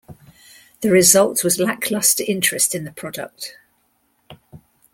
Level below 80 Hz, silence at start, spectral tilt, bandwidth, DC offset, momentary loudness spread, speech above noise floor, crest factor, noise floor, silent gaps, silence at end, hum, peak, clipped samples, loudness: -60 dBFS; 0.1 s; -2.5 dB/octave; 16.5 kHz; under 0.1%; 18 LU; 46 dB; 20 dB; -64 dBFS; none; 0.35 s; none; 0 dBFS; under 0.1%; -16 LUFS